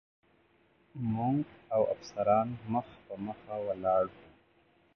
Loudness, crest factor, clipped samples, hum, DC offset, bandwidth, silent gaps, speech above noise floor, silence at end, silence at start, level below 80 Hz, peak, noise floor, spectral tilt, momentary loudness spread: -33 LUFS; 20 dB; under 0.1%; none; under 0.1%; 6.6 kHz; none; 36 dB; 0.75 s; 0.95 s; -64 dBFS; -14 dBFS; -68 dBFS; -8.5 dB/octave; 12 LU